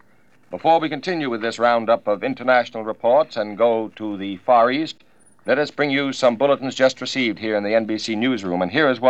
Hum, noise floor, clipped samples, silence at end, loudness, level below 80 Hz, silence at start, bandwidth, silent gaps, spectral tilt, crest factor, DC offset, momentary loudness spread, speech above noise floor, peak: none; -58 dBFS; under 0.1%; 0 s; -20 LUFS; -70 dBFS; 0.5 s; 10 kHz; none; -5 dB/octave; 18 dB; 0.2%; 9 LU; 39 dB; -2 dBFS